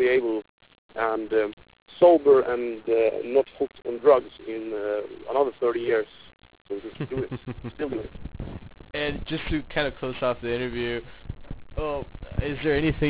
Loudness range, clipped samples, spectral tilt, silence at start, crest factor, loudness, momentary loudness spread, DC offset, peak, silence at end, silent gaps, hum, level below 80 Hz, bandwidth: 10 LU; under 0.1%; -10 dB/octave; 0 s; 20 dB; -25 LUFS; 18 LU; under 0.1%; -6 dBFS; 0 s; 0.49-0.58 s, 0.78-0.89 s, 1.53-1.57 s, 1.82-1.86 s, 6.61-6.65 s; none; -44 dBFS; 4 kHz